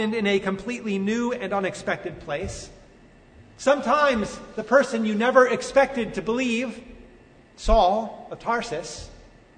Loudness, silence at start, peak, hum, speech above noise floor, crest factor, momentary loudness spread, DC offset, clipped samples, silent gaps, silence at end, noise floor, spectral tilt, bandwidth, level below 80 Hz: -23 LUFS; 0 s; -4 dBFS; none; 28 dB; 20 dB; 14 LU; under 0.1%; under 0.1%; none; 0.35 s; -51 dBFS; -5 dB/octave; 9.6 kHz; -40 dBFS